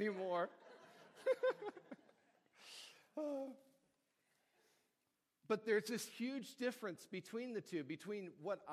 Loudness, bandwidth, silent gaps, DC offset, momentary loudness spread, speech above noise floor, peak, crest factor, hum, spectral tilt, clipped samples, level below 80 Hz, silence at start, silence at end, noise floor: -44 LUFS; 15.5 kHz; none; under 0.1%; 22 LU; 44 dB; -24 dBFS; 20 dB; none; -4.5 dB/octave; under 0.1%; under -90 dBFS; 0 s; 0 s; -87 dBFS